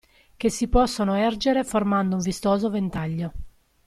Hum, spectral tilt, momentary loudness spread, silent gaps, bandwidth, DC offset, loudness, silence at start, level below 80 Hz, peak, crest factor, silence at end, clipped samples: none; -5.5 dB/octave; 7 LU; none; 14 kHz; under 0.1%; -24 LUFS; 0.4 s; -38 dBFS; -6 dBFS; 18 dB; 0.35 s; under 0.1%